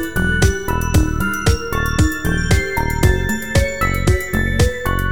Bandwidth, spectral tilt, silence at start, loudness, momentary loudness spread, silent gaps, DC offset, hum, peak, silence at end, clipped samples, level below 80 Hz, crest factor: over 20 kHz; -5 dB/octave; 0 s; -18 LUFS; 3 LU; none; 3%; none; -2 dBFS; 0 s; under 0.1%; -22 dBFS; 14 dB